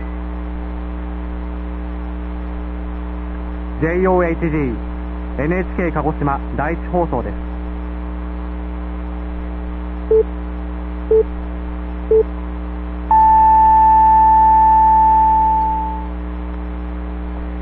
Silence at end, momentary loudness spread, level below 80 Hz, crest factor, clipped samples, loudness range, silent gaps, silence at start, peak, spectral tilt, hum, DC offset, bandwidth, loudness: 0 s; 17 LU; -26 dBFS; 14 dB; under 0.1%; 13 LU; none; 0 s; -2 dBFS; -10 dB/octave; 60 Hz at -25 dBFS; under 0.1%; 4.1 kHz; -17 LUFS